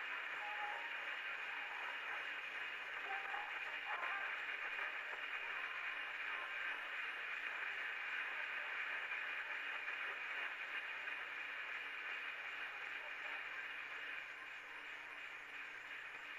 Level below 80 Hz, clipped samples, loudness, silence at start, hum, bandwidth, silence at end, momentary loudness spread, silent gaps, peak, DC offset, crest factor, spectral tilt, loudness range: -86 dBFS; under 0.1%; -44 LUFS; 0 s; none; 14.5 kHz; 0 s; 6 LU; none; -28 dBFS; under 0.1%; 18 dB; -0.5 dB/octave; 3 LU